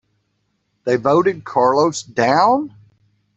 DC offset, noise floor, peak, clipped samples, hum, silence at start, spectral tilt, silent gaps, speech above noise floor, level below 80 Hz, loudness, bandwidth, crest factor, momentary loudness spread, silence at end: under 0.1%; -68 dBFS; 0 dBFS; under 0.1%; none; 0.85 s; -5 dB/octave; none; 53 dB; -60 dBFS; -16 LUFS; 8.2 kHz; 18 dB; 7 LU; 0.7 s